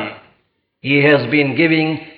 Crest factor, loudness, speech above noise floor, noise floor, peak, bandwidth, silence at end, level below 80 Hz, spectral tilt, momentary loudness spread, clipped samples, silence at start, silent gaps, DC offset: 16 dB; -14 LUFS; 49 dB; -64 dBFS; -2 dBFS; 5.2 kHz; 0.05 s; -64 dBFS; -9 dB/octave; 13 LU; under 0.1%; 0 s; none; under 0.1%